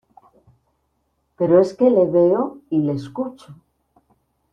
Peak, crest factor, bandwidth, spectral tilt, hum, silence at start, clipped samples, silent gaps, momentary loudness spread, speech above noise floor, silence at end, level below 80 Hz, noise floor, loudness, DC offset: -4 dBFS; 18 dB; 8.6 kHz; -9 dB/octave; none; 1.4 s; under 0.1%; none; 13 LU; 52 dB; 1 s; -60 dBFS; -69 dBFS; -18 LUFS; under 0.1%